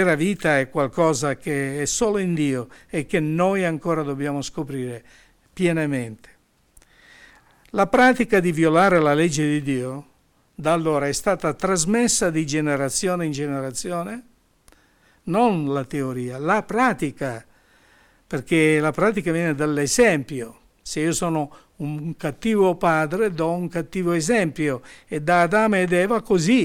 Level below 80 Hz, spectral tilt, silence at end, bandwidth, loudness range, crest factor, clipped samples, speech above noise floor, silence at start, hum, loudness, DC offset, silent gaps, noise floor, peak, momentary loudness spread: -50 dBFS; -5 dB/octave; 0 s; 17 kHz; 6 LU; 16 dB; under 0.1%; 39 dB; 0 s; none; -21 LUFS; under 0.1%; none; -60 dBFS; -6 dBFS; 13 LU